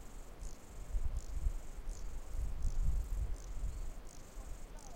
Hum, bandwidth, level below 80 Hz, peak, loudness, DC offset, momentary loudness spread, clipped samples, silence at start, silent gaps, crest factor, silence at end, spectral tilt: none; 16 kHz; -40 dBFS; -24 dBFS; -46 LUFS; under 0.1%; 12 LU; under 0.1%; 0 s; none; 14 dB; 0 s; -5.5 dB/octave